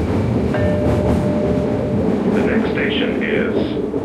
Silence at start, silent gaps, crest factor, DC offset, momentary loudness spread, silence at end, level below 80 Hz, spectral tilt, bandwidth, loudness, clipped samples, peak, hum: 0 s; none; 12 dB; under 0.1%; 2 LU; 0 s; -34 dBFS; -8 dB/octave; 12 kHz; -18 LUFS; under 0.1%; -6 dBFS; none